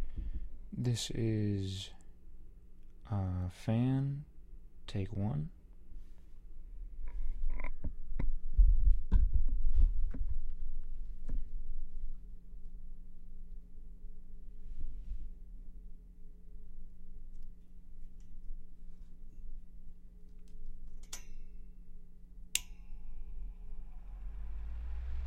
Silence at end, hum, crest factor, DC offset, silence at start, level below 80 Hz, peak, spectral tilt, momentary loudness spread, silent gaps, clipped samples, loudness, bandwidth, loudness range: 0 s; none; 22 dB; under 0.1%; 0 s; -36 dBFS; -12 dBFS; -5.5 dB/octave; 25 LU; none; under 0.1%; -39 LUFS; 12 kHz; 20 LU